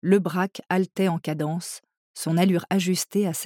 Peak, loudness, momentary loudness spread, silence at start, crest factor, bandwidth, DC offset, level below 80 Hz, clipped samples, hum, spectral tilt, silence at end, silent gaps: -8 dBFS; -24 LUFS; 11 LU; 0.05 s; 16 dB; 18 kHz; under 0.1%; -78 dBFS; under 0.1%; none; -5.5 dB/octave; 0 s; 1.97-2.14 s